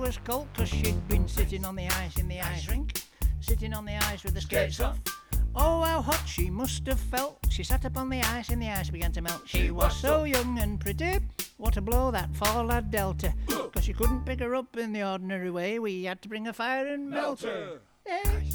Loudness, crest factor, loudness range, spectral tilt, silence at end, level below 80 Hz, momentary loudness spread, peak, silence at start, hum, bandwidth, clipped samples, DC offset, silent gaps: -30 LUFS; 18 dB; 3 LU; -5 dB/octave; 0 s; -32 dBFS; 6 LU; -10 dBFS; 0 s; none; over 20 kHz; under 0.1%; under 0.1%; none